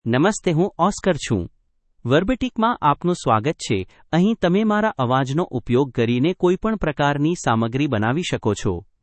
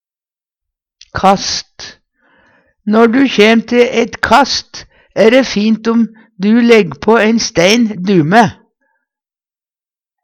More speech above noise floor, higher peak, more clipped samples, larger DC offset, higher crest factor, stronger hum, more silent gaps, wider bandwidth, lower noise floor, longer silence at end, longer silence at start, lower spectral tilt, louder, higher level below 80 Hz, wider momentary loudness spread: second, 40 dB vs over 80 dB; about the same, -2 dBFS vs 0 dBFS; second, under 0.1% vs 0.1%; neither; first, 18 dB vs 12 dB; neither; neither; second, 8.8 kHz vs 12.5 kHz; second, -60 dBFS vs under -90 dBFS; second, 0.2 s vs 1.7 s; second, 0.05 s vs 1.15 s; first, -6 dB/octave vs -4.5 dB/octave; second, -20 LUFS vs -11 LUFS; about the same, -44 dBFS vs -46 dBFS; second, 6 LU vs 15 LU